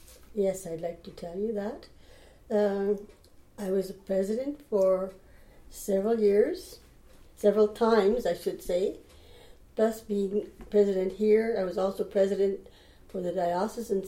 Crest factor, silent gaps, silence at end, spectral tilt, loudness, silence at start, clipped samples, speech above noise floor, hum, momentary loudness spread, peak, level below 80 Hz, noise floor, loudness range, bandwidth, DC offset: 18 dB; none; 0 s; -6 dB/octave; -28 LUFS; 0.1 s; under 0.1%; 26 dB; none; 15 LU; -10 dBFS; -56 dBFS; -53 dBFS; 5 LU; 16.5 kHz; under 0.1%